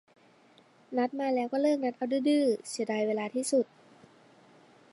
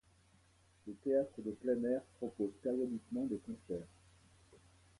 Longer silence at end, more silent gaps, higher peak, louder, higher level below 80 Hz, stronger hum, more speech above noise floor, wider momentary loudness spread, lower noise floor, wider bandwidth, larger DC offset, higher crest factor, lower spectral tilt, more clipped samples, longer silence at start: first, 1.3 s vs 0.45 s; neither; first, -16 dBFS vs -24 dBFS; first, -30 LUFS vs -40 LUFS; second, -88 dBFS vs -72 dBFS; neither; about the same, 32 dB vs 31 dB; second, 6 LU vs 11 LU; second, -61 dBFS vs -69 dBFS; about the same, 11.5 kHz vs 11.5 kHz; neither; about the same, 16 dB vs 18 dB; second, -4 dB/octave vs -8 dB/octave; neither; about the same, 0.9 s vs 0.85 s